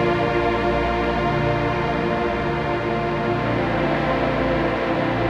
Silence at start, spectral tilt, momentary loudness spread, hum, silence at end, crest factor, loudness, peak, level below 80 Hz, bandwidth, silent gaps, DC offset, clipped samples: 0 s; -7.5 dB/octave; 2 LU; none; 0 s; 14 dB; -21 LUFS; -8 dBFS; -36 dBFS; 9 kHz; none; under 0.1%; under 0.1%